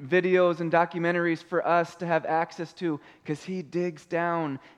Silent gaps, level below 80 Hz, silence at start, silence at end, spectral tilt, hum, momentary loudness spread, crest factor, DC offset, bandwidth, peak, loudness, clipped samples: none; -76 dBFS; 0 s; 0.2 s; -7 dB/octave; none; 10 LU; 18 dB; under 0.1%; 10 kHz; -8 dBFS; -27 LUFS; under 0.1%